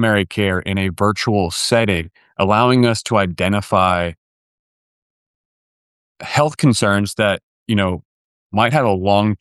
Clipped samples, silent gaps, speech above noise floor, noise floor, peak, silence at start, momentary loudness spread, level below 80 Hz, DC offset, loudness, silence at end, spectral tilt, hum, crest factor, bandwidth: under 0.1%; 4.18-6.15 s, 7.43-7.66 s, 8.05-8.50 s; over 74 dB; under -90 dBFS; -2 dBFS; 0 s; 7 LU; -46 dBFS; under 0.1%; -17 LUFS; 0.05 s; -5.5 dB/octave; none; 16 dB; 12.5 kHz